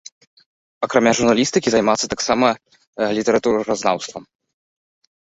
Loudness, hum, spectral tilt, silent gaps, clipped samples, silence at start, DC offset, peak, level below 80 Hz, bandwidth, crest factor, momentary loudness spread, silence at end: -18 LUFS; none; -3.5 dB/octave; 2.87-2.93 s; under 0.1%; 0.8 s; under 0.1%; -2 dBFS; -54 dBFS; 8.2 kHz; 18 dB; 13 LU; 1.05 s